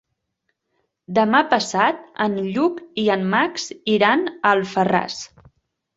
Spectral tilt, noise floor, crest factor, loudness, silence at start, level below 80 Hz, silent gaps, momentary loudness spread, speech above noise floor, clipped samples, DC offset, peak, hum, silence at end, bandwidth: -4.5 dB/octave; -74 dBFS; 18 dB; -20 LUFS; 1.1 s; -62 dBFS; none; 7 LU; 55 dB; under 0.1%; under 0.1%; -2 dBFS; none; 0.7 s; 8 kHz